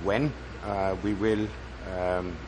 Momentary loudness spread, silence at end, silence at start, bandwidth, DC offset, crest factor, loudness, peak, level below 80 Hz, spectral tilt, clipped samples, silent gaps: 10 LU; 0 s; 0 s; 9.8 kHz; under 0.1%; 18 dB; -30 LUFS; -10 dBFS; -42 dBFS; -7 dB/octave; under 0.1%; none